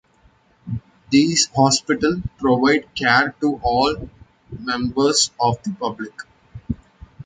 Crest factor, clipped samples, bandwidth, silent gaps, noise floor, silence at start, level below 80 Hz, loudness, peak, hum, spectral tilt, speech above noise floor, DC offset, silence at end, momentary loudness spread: 18 dB; under 0.1%; 9.6 kHz; none; -56 dBFS; 0.65 s; -44 dBFS; -18 LUFS; -2 dBFS; none; -3.5 dB/octave; 38 dB; under 0.1%; 0.05 s; 16 LU